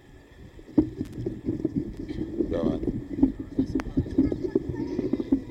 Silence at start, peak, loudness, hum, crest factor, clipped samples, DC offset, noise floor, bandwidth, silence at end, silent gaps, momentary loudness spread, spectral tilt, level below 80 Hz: 0.1 s; -8 dBFS; -29 LUFS; none; 20 dB; under 0.1%; under 0.1%; -48 dBFS; 8 kHz; 0 s; none; 8 LU; -9 dB/octave; -42 dBFS